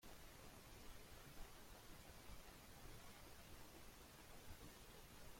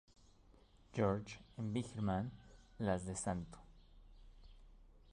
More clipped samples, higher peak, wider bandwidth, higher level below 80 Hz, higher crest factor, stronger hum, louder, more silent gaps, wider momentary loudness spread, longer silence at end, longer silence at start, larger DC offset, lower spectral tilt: neither; second, -42 dBFS vs -24 dBFS; first, 16.5 kHz vs 11 kHz; second, -66 dBFS vs -60 dBFS; about the same, 18 dB vs 20 dB; neither; second, -62 LUFS vs -42 LUFS; neither; second, 1 LU vs 15 LU; about the same, 0 s vs 0 s; second, 0 s vs 0.9 s; neither; second, -3.5 dB/octave vs -6 dB/octave